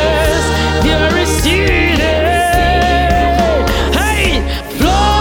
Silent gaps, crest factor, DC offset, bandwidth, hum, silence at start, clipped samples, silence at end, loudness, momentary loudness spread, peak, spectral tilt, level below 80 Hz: none; 12 dB; under 0.1%; 18 kHz; none; 0 s; under 0.1%; 0 s; -12 LUFS; 2 LU; 0 dBFS; -4.5 dB/octave; -18 dBFS